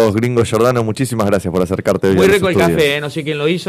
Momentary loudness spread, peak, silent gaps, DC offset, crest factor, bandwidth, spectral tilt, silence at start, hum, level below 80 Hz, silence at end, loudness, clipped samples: 7 LU; -2 dBFS; none; under 0.1%; 12 dB; 15 kHz; -6 dB/octave; 0 s; none; -42 dBFS; 0 s; -14 LUFS; under 0.1%